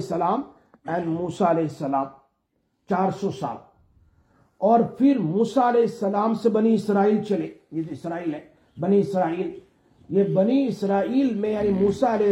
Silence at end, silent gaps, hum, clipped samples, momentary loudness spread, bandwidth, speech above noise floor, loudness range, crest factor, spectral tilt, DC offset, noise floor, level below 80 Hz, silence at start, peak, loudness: 0 s; none; none; under 0.1%; 12 LU; 11.5 kHz; 50 dB; 5 LU; 16 dB; -8 dB/octave; under 0.1%; -72 dBFS; -60 dBFS; 0 s; -6 dBFS; -23 LUFS